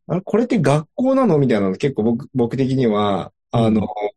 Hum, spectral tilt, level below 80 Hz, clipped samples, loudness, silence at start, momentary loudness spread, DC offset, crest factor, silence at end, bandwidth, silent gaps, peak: none; -8 dB/octave; -54 dBFS; under 0.1%; -18 LUFS; 0.1 s; 5 LU; under 0.1%; 16 dB; 0.05 s; 10.5 kHz; none; -2 dBFS